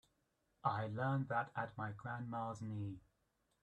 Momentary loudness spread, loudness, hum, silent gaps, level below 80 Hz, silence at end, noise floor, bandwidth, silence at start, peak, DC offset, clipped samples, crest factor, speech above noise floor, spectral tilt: 8 LU; -43 LUFS; none; none; -74 dBFS; 0.65 s; -82 dBFS; 9 kHz; 0.65 s; -22 dBFS; under 0.1%; under 0.1%; 22 dB; 40 dB; -8 dB/octave